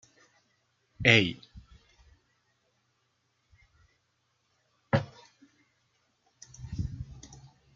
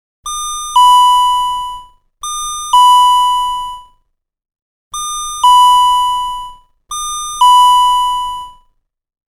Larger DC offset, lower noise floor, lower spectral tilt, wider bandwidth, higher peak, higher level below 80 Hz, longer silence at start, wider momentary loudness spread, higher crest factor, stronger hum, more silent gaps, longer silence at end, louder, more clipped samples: neither; first, -75 dBFS vs -60 dBFS; first, -5 dB/octave vs 2.5 dB/octave; second, 7.6 kHz vs 15.5 kHz; second, -4 dBFS vs 0 dBFS; second, -56 dBFS vs -40 dBFS; first, 1 s vs 0.25 s; first, 26 LU vs 18 LU; first, 32 dB vs 12 dB; neither; second, none vs 4.62-4.91 s; second, 0.4 s vs 0.8 s; second, -27 LUFS vs -10 LUFS; neither